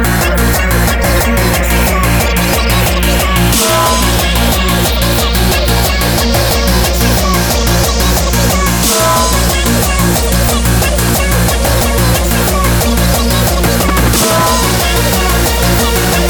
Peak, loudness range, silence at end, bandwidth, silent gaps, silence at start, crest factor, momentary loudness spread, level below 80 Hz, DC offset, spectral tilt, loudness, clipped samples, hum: 0 dBFS; 1 LU; 0 s; over 20 kHz; none; 0 s; 10 dB; 2 LU; -16 dBFS; under 0.1%; -4 dB/octave; -10 LUFS; under 0.1%; none